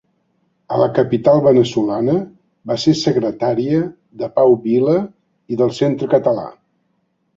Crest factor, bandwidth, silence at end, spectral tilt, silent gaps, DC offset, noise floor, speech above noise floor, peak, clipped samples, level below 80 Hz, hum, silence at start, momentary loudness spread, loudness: 16 dB; 7.8 kHz; 0.85 s; -7 dB/octave; none; under 0.1%; -66 dBFS; 50 dB; 0 dBFS; under 0.1%; -56 dBFS; none; 0.7 s; 13 LU; -16 LUFS